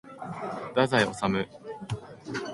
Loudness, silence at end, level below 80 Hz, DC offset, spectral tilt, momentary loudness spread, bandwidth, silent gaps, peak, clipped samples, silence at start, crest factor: -29 LUFS; 0 s; -58 dBFS; under 0.1%; -5.5 dB/octave; 14 LU; 11.5 kHz; none; -8 dBFS; under 0.1%; 0.05 s; 22 dB